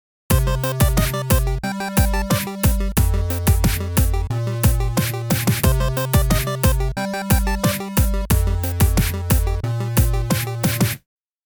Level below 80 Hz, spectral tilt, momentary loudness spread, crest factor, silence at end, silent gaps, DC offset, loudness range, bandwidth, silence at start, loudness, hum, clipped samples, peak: -22 dBFS; -5 dB/octave; 4 LU; 16 dB; 0.5 s; none; under 0.1%; 1 LU; over 20 kHz; 0.3 s; -20 LUFS; none; under 0.1%; -2 dBFS